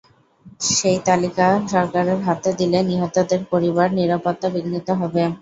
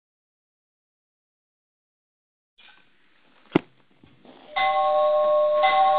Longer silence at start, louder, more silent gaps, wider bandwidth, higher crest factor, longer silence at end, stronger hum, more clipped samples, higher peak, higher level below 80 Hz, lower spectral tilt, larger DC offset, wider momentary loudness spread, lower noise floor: second, 0.45 s vs 3.55 s; first, -19 LUFS vs -22 LUFS; neither; first, 8 kHz vs 4.7 kHz; second, 16 dB vs 26 dB; about the same, 0.05 s vs 0 s; neither; neither; about the same, -2 dBFS vs 0 dBFS; first, -56 dBFS vs -68 dBFS; second, -5 dB/octave vs -7.5 dB/octave; neither; second, 5 LU vs 8 LU; second, -48 dBFS vs -62 dBFS